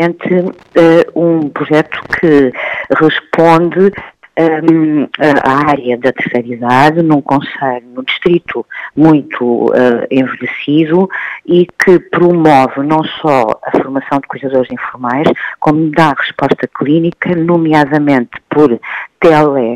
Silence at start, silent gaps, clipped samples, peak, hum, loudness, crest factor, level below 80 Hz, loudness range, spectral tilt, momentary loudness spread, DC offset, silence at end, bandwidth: 0 s; none; 0.5%; 0 dBFS; none; -11 LUFS; 10 dB; -48 dBFS; 2 LU; -7.5 dB/octave; 8 LU; under 0.1%; 0 s; 10.5 kHz